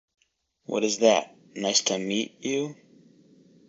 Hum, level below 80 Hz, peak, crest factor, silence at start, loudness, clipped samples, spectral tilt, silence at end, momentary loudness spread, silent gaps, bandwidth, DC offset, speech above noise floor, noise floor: none; -74 dBFS; -6 dBFS; 22 dB; 0.7 s; -25 LUFS; under 0.1%; -2.5 dB/octave; 0.95 s; 13 LU; none; 8 kHz; under 0.1%; 31 dB; -57 dBFS